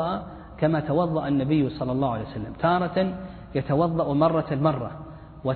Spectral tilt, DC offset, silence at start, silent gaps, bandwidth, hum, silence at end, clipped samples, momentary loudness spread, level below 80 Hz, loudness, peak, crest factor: -11.5 dB/octave; under 0.1%; 0 s; none; 4.5 kHz; none; 0 s; under 0.1%; 12 LU; -48 dBFS; -25 LUFS; -8 dBFS; 18 dB